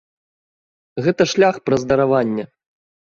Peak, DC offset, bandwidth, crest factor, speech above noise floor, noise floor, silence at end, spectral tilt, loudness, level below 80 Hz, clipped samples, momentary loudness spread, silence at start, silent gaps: -2 dBFS; under 0.1%; 7.4 kHz; 18 dB; over 73 dB; under -90 dBFS; 0.7 s; -5.5 dB/octave; -18 LUFS; -54 dBFS; under 0.1%; 13 LU; 0.95 s; none